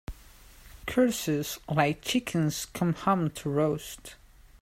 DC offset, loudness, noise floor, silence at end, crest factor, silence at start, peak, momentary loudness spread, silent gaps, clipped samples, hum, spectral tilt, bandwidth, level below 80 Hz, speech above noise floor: under 0.1%; -28 LUFS; -52 dBFS; 0.45 s; 20 dB; 0.1 s; -10 dBFS; 15 LU; none; under 0.1%; none; -5 dB/octave; 16 kHz; -52 dBFS; 24 dB